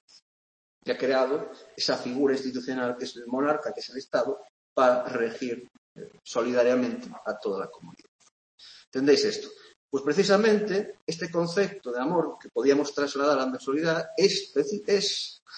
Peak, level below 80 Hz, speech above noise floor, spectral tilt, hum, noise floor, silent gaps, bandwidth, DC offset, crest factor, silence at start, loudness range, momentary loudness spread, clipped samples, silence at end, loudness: -8 dBFS; -74 dBFS; over 63 dB; -4 dB/octave; none; under -90 dBFS; 4.50-4.76 s, 5.78-5.96 s, 8.08-8.19 s, 8.31-8.58 s, 8.87-8.92 s, 9.76-9.89 s, 11.02-11.07 s, 15.42-15.46 s; 8.8 kHz; under 0.1%; 20 dB; 0.85 s; 4 LU; 13 LU; under 0.1%; 0 s; -27 LUFS